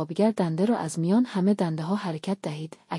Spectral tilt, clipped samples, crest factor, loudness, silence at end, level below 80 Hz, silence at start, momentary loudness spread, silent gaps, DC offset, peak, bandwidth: -7 dB/octave; under 0.1%; 14 dB; -26 LUFS; 0 s; -72 dBFS; 0 s; 8 LU; none; under 0.1%; -10 dBFS; 12 kHz